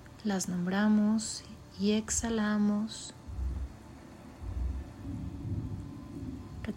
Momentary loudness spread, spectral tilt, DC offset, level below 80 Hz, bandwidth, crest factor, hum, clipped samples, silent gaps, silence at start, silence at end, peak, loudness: 17 LU; -5 dB/octave; under 0.1%; -44 dBFS; 15.5 kHz; 14 dB; none; under 0.1%; none; 0 s; 0 s; -18 dBFS; -33 LUFS